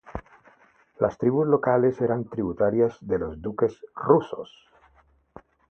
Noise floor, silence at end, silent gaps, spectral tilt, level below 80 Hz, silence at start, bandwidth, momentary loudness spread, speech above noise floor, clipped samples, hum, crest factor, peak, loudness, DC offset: -61 dBFS; 1.25 s; none; -9.5 dB/octave; -52 dBFS; 0.1 s; 6.4 kHz; 15 LU; 37 dB; under 0.1%; none; 22 dB; -4 dBFS; -24 LUFS; under 0.1%